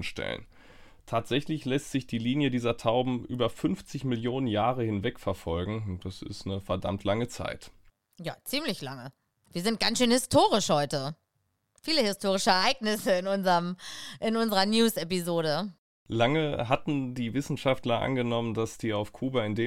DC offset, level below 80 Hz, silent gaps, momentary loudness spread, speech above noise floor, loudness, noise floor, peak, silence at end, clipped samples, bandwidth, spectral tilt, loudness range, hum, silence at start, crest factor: under 0.1%; -54 dBFS; 15.78-16.06 s; 13 LU; 48 dB; -29 LUFS; -77 dBFS; -8 dBFS; 0 s; under 0.1%; 16.5 kHz; -5 dB/octave; 7 LU; none; 0 s; 20 dB